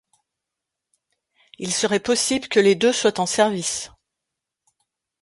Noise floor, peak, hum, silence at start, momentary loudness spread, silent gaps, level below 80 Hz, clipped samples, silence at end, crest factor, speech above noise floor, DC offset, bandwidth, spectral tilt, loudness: -84 dBFS; -4 dBFS; none; 1.6 s; 10 LU; none; -60 dBFS; under 0.1%; 1.35 s; 20 dB; 64 dB; under 0.1%; 11.5 kHz; -3 dB/octave; -20 LUFS